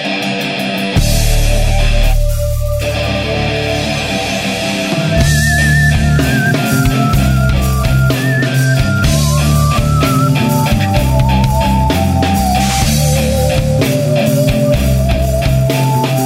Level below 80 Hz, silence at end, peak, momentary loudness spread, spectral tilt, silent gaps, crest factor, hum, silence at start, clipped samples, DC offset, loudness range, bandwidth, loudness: -18 dBFS; 0 s; 0 dBFS; 4 LU; -5 dB/octave; none; 12 dB; none; 0 s; under 0.1%; under 0.1%; 3 LU; 16.5 kHz; -13 LUFS